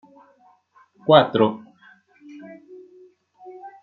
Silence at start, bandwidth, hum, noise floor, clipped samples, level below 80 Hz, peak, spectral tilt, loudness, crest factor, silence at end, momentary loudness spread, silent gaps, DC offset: 1.05 s; 4.5 kHz; none; -57 dBFS; under 0.1%; -66 dBFS; -2 dBFS; -4 dB/octave; -18 LUFS; 22 dB; 0.15 s; 27 LU; none; under 0.1%